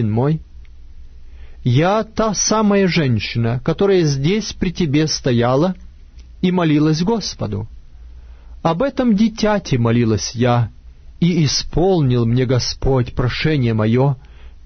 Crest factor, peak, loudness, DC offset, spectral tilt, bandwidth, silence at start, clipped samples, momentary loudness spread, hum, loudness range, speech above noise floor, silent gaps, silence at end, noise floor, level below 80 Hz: 14 dB; -4 dBFS; -17 LUFS; under 0.1%; -5.5 dB/octave; 6.6 kHz; 0 s; under 0.1%; 7 LU; none; 3 LU; 23 dB; none; 0.05 s; -39 dBFS; -34 dBFS